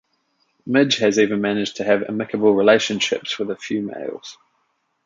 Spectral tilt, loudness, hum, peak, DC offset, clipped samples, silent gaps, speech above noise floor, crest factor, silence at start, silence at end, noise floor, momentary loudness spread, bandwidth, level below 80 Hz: -4 dB/octave; -19 LUFS; none; -2 dBFS; under 0.1%; under 0.1%; none; 50 dB; 18 dB; 0.65 s; 0.7 s; -69 dBFS; 15 LU; 7.6 kHz; -64 dBFS